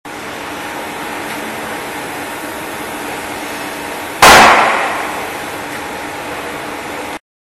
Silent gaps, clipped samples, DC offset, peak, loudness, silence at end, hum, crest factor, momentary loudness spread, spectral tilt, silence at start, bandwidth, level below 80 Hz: none; 0.4%; under 0.1%; 0 dBFS; -15 LUFS; 0.4 s; none; 16 dB; 17 LU; -2 dB/octave; 0.05 s; 15.5 kHz; -42 dBFS